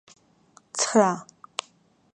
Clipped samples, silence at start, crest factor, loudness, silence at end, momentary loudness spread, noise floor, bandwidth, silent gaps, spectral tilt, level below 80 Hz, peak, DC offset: under 0.1%; 0.75 s; 24 dB; -25 LUFS; 0.95 s; 15 LU; -61 dBFS; 10.5 kHz; none; -3.5 dB/octave; -74 dBFS; -4 dBFS; under 0.1%